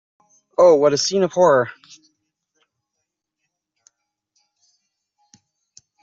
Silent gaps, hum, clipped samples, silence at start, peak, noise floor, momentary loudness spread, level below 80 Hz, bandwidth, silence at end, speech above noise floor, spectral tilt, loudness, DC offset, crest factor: none; none; under 0.1%; 0.6 s; -4 dBFS; -80 dBFS; 11 LU; -68 dBFS; 7.8 kHz; 4.3 s; 64 dB; -3.5 dB/octave; -16 LUFS; under 0.1%; 18 dB